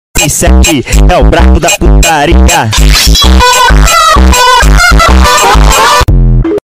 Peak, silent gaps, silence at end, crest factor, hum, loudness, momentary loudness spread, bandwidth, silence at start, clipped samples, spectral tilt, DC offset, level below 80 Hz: 0 dBFS; none; 0.1 s; 4 dB; none; -4 LUFS; 3 LU; 16.5 kHz; 0.15 s; 0.4%; -3.5 dB/octave; 3%; -6 dBFS